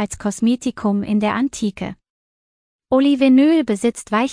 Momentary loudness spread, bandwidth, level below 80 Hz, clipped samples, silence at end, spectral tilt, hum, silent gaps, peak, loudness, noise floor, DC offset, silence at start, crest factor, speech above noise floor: 11 LU; 10.5 kHz; -50 dBFS; under 0.1%; 0 s; -5.5 dB/octave; none; 2.10-2.79 s; -4 dBFS; -18 LUFS; under -90 dBFS; under 0.1%; 0 s; 14 dB; over 73 dB